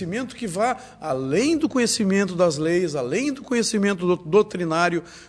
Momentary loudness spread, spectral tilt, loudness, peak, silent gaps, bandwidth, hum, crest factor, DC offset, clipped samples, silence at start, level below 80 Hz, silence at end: 8 LU; -4.5 dB/octave; -22 LUFS; -6 dBFS; none; 11 kHz; none; 16 dB; under 0.1%; under 0.1%; 0 s; -56 dBFS; 0 s